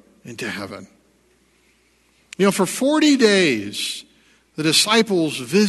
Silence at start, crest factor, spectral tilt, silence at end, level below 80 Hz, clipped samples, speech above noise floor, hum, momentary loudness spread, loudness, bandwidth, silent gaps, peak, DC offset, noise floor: 0.25 s; 20 dB; -3.5 dB/octave; 0 s; -66 dBFS; under 0.1%; 41 dB; none; 20 LU; -18 LUFS; 12.5 kHz; none; 0 dBFS; under 0.1%; -59 dBFS